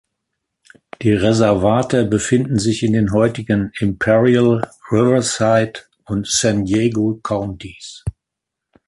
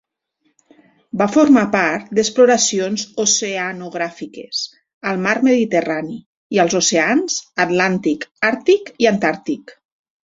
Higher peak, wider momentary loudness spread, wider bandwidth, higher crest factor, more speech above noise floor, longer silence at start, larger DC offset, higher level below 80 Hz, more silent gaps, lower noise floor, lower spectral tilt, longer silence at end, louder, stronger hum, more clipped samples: about the same, -2 dBFS vs 0 dBFS; about the same, 13 LU vs 13 LU; first, 11.5 kHz vs 7.8 kHz; about the same, 14 dB vs 18 dB; first, 65 dB vs 50 dB; second, 1 s vs 1.15 s; neither; first, -42 dBFS vs -60 dBFS; second, none vs 4.94-5.01 s, 6.26-6.50 s, 8.31-8.35 s; first, -82 dBFS vs -67 dBFS; first, -5.5 dB/octave vs -3.5 dB/octave; first, 0.8 s vs 0.55 s; about the same, -16 LUFS vs -17 LUFS; neither; neither